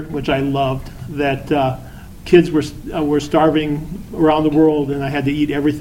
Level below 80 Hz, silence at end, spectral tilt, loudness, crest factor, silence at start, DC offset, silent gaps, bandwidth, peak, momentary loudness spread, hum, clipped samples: -36 dBFS; 0 s; -7 dB/octave; -17 LUFS; 16 dB; 0 s; under 0.1%; none; 16 kHz; 0 dBFS; 13 LU; none; under 0.1%